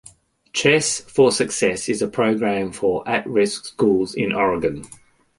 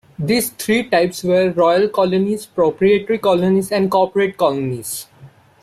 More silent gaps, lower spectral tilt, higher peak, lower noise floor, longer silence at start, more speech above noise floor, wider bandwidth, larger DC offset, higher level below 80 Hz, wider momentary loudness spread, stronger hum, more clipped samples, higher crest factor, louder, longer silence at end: neither; about the same, -4 dB/octave vs -5 dB/octave; about the same, -2 dBFS vs -4 dBFS; first, -50 dBFS vs -45 dBFS; first, 0.55 s vs 0.2 s; about the same, 30 dB vs 28 dB; second, 11.5 kHz vs 16 kHz; neither; about the same, -54 dBFS vs -56 dBFS; about the same, 6 LU vs 7 LU; neither; neither; first, 20 dB vs 14 dB; second, -20 LUFS vs -17 LUFS; about the same, 0.45 s vs 0.35 s